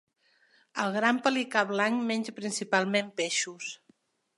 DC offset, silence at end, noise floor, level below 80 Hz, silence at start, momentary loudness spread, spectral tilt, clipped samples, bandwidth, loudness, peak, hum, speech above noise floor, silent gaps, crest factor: under 0.1%; 0.65 s; -67 dBFS; -82 dBFS; 0.75 s; 12 LU; -3 dB/octave; under 0.1%; 11.5 kHz; -28 LUFS; -10 dBFS; none; 38 dB; none; 20 dB